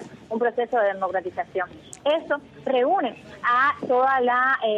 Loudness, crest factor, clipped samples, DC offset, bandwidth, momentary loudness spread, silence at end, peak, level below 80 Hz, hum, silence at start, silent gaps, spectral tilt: -23 LUFS; 12 dB; under 0.1%; under 0.1%; 9.8 kHz; 10 LU; 0 s; -10 dBFS; -66 dBFS; none; 0 s; none; -4.5 dB/octave